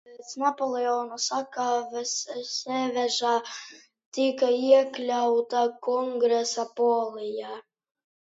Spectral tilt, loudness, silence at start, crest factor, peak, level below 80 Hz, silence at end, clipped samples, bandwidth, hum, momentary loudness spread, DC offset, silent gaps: -1.5 dB/octave; -26 LUFS; 0.05 s; 20 dB; -8 dBFS; -82 dBFS; 0.7 s; under 0.1%; 8 kHz; none; 12 LU; under 0.1%; 4.06-4.12 s